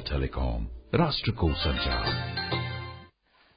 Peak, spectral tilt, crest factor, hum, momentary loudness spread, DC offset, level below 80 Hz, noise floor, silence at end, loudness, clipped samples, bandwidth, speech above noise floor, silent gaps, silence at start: -8 dBFS; -10 dB/octave; 20 dB; none; 10 LU; under 0.1%; -36 dBFS; -62 dBFS; 0.5 s; -29 LUFS; under 0.1%; 5.2 kHz; 34 dB; none; 0 s